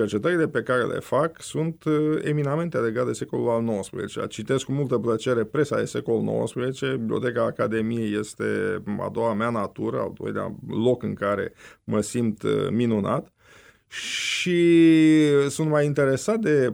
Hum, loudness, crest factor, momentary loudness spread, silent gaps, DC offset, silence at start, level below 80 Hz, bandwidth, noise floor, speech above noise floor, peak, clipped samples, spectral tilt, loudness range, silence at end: none; -24 LUFS; 14 dB; 9 LU; none; under 0.1%; 0 s; -62 dBFS; 15.5 kHz; -53 dBFS; 30 dB; -8 dBFS; under 0.1%; -6 dB/octave; 6 LU; 0 s